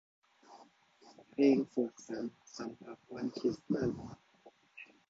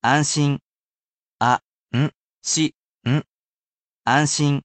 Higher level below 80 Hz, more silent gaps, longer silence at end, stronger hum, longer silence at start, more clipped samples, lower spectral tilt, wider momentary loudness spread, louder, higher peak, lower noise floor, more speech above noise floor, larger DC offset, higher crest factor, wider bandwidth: second, -70 dBFS vs -60 dBFS; second, none vs 0.62-1.39 s, 1.64-1.87 s, 2.16-2.41 s, 2.74-2.99 s, 3.28-4.02 s; first, 0.25 s vs 0.05 s; neither; first, 0.5 s vs 0.05 s; neither; first, -6.5 dB/octave vs -4 dB/octave; first, 24 LU vs 10 LU; second, -36 LUFS vs -22 LUFS; second, -16 dBFS vs -4 dBFS; second, -64 dBFS vs under -90 dBFS; second, 29 dB vs over 71 dB; neither; about the same, 22 dB vs 18 dB; second, 7.6 kHz vs 9 kHz